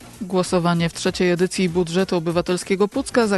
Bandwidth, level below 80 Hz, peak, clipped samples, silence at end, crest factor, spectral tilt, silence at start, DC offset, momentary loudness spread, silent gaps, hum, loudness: 12.5 kHz; -48 dBFS; -4 dBFS; under 0.1%; 0 s; 16 dB; -5.5 dB/octave; 0 s; under 0.1%; 3 LU; none; none; -21 LUFS